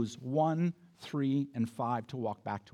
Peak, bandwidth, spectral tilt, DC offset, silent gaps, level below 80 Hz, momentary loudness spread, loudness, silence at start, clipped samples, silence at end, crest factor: -18 dBFS; 12.5 kHz; -7.5 dB/octave; under 0.1%; none; -80 dBFS; 9 LU; -34 LUFS; 0 s; under 0.1%; 0.15 s; 16 dB